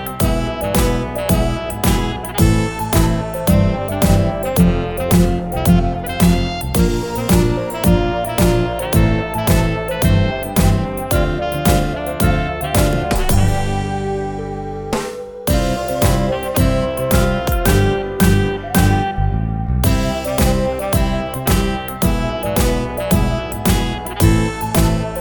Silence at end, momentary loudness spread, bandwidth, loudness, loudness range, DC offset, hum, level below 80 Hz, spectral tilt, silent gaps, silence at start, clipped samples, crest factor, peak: 0 s; 5 LU; 19.5 kHz; -17 LUFS; 3 LU; 0.4%; none; -22 dBFS; -6 dB/octave; none; 0 s; under 0.1%; 16 dB; 0 dBFS